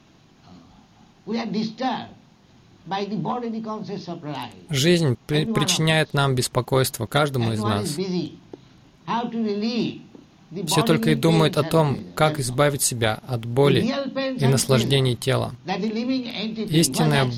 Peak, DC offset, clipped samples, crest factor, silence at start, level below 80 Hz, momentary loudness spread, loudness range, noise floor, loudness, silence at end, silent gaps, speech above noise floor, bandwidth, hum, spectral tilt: -6 dBFS; under 0.1%; under 0.1%; 18 dB; 0.5 s; -52 dBFS; 12 LU; 8 LU; -53 dBFS; -22 LUFS; 0 s; none; 31 dB; 16.5 kHz; none; -5 dB/octave